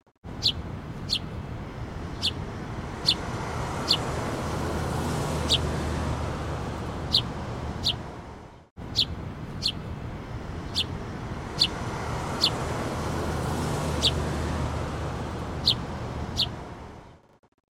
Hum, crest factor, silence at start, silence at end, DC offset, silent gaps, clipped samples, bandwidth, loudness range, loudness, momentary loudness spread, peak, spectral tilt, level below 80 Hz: none; 22 dB; 0.25 s; 0.5 s; under 0.1%; 8.71-8.76 s; under 0.1%; 16 kHz; 3 LU; -28 LUFS; 13 LU; -8 dBFS; -4.5 dB/octave; -40 dBFS